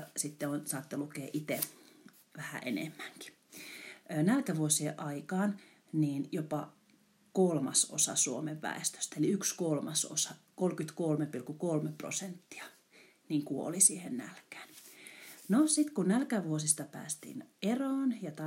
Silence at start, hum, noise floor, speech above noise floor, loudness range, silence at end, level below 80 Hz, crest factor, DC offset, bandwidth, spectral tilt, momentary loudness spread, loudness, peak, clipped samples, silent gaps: 0 s; none; -67 dBFS; 34 dB; 6 LU; 0 s; -88 dBFS; 22 dB; under 0.1%; 16 kHz; -4 dB/octave; 19 LU; -33 LUFS; -12 dBFS; under 0.1%; none